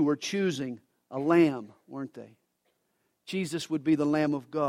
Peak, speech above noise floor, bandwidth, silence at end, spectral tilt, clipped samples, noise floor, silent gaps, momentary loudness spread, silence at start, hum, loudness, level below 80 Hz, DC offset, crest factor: -10 dBFS; 48 dB; 13 kHz; 0 s; -6 dB/octave; under 0.1%; -76 dBFS; none; 18 LU; 0 s; none; -28 LUFS; -74 dBFS; under 0.1%; 20 dB